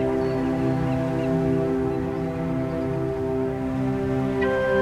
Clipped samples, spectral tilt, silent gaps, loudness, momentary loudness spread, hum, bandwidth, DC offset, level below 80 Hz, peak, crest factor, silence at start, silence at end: under 0.1%; -8.5 dB/octave; none; -25 LUFS; 4 LU; none; 11.5 kHz; under 0.1%; -42 dBFS; -10 dBFS; 12 dB; 0 s; 0 s